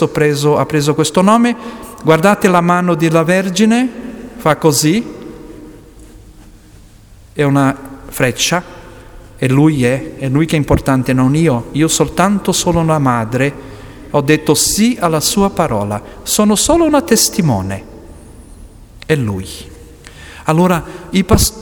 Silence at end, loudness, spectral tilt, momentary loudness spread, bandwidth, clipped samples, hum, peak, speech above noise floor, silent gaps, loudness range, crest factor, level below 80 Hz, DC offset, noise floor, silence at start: 0 s; -13 LUFS; -5 dB/octave; 16 LU; over 20 kHz; under 0.1%; none; 0 dBFS; 27 dB; none; 6 LU; 14 dB; -34 dBFS; under 0.1%; -40 dBFS; 0 s